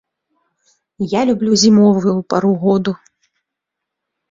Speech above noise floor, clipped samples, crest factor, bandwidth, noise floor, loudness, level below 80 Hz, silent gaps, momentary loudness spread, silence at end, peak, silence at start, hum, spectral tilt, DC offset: 67 dB; under 0.1%; 16 dB; 7.8 kHz; -80 dBFS; -14 LUFS; -56 dBFS; none; 13 LU; 1.35 s; -2 dBFS; 1 s; none; -5.5 dB/octave; under 0.1%